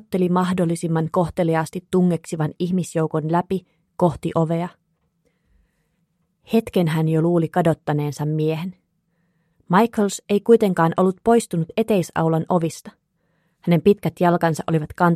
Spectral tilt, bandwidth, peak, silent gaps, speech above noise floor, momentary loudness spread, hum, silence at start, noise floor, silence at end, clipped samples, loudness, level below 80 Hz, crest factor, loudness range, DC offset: -7 dB/octave; 14 kHz; -2 dBFS; none; 49 dB; 7 LU; none; 0.1 s; -69 dBFS; 0 s; under 0.1%; -20 LUFS; -54 dBFS; 18 dB; 5 LU; under 0.1%